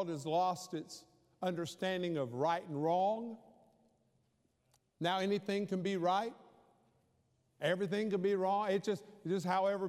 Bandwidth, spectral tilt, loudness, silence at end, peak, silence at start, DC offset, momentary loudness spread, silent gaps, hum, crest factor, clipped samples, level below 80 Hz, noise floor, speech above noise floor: 15 kHz; -5.5 dB/octave; -36 LUFS; 0 s; -20 dBFS; 0 s; under 0.1%; 9 LU; none; none; 16 dB; under 0.1%; -86 dBFS; -77 dBFS; 42 dB